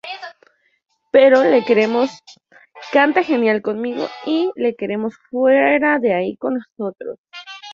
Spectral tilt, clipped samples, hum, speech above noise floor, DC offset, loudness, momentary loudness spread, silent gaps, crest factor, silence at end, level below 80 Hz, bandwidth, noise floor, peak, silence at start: -6 dB/octave; under 0.1%; none; 41 dB; under 0.1%; -17 LUFS; 19 LU; 7.18-7.24 s; 16 dB; 0 s; -64 dBFS; 7.2 kHz; -57 dBFS; -2 dBFS; 0.05 s